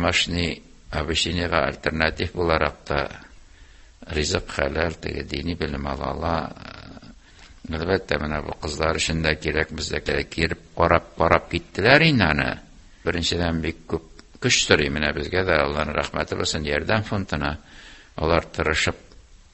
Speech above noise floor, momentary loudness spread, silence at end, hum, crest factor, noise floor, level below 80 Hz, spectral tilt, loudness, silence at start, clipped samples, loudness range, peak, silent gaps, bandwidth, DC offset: 25 dB; 12 LU; 0.15 s; none; 24 dB; -48 dBFS; -36 dBFS; -4 dB/octave; -23 LUFS; 0 s; under 0.1%; 7 LU; 0 dBFS; none; 8.6 kHz; under 0.1%